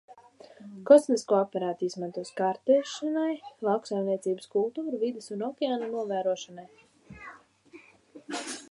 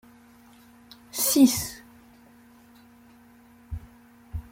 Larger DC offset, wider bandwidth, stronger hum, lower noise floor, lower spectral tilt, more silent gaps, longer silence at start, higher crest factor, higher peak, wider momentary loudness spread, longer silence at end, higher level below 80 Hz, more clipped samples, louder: neither; second, 11.5 kHz vs 16.5 kHz; neither; about the same, -54 dBFS vs -54 dBFS; first, -5 dB/octave vs -3.5 dB/octave; neither; second, 0.1 s vs 1.15 s; about the same, 24 dB vs 22 dB; about the same, -6 dBFS vs -6 dBFS; about the same, 21 LU vs 22 LU; about the same, 0.05 s vs 0.1 s; second, -74 dBFS vs -50 dBFS; neither; second, -28 LUFS vs -22 LUFS